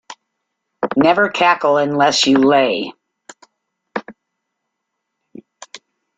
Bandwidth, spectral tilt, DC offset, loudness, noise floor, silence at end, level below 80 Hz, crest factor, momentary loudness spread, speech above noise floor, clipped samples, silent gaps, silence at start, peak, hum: 9.4 kHz; -3.5 dB/octave; under 0.1%; -14 LUFS; -76 dBFS; 0.4 s; -60 dBFS; 18 dB; 17 LU; 62 dB; under 0.1%; none; 0.1 s; -2 dBFS; none